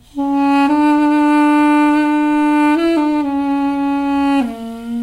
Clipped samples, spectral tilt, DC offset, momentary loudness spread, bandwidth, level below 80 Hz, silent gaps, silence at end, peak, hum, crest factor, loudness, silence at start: under 0.1%; -5 dB/octave; under 0.1%; 6 LU; 11.5 kHz; -46 dBFS; none; 0 s; -6 dBFS; none; 8 dB; -14 LUFS; 0.15 s